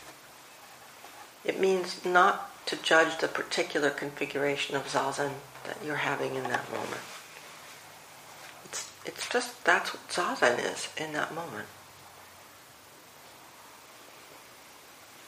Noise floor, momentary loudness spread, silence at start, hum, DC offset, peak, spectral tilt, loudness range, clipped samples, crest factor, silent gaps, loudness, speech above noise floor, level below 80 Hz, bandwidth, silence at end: -53 dBFS; 24 LU; 0 s; none; under 0.1%; -6 dBFS; -3 dB/octave; 13 LU; under 0.1%; 26 dB; none; -29 LUFS; 23 dB; -74 dBFS; 15.5 kHz; 0 s